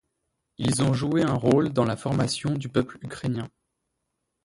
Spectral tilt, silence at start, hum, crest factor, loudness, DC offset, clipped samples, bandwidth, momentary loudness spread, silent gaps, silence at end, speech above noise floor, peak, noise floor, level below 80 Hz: -6 dB/octave; 0.6 s; none; 18 dB; -25 LUFS; under 0.1%; under 0.1%; 11.5 kHz; 11 LU; none; 0.95 s; 55 dB; -8 dBFS; -79 dBFS; -54 dBFS